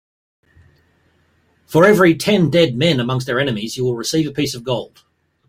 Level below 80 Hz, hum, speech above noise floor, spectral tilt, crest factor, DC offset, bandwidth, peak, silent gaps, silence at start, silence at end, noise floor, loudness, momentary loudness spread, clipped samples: -52 dBFS; none; 43 dB; -5.5 dB/octave; 16 dB; under 0.1%; 16.5 kHz; -2 dBFS; none; 1.7 s; 0.6 s; -59 dBFS; -16 LUFS; 11 LU; under 0.1%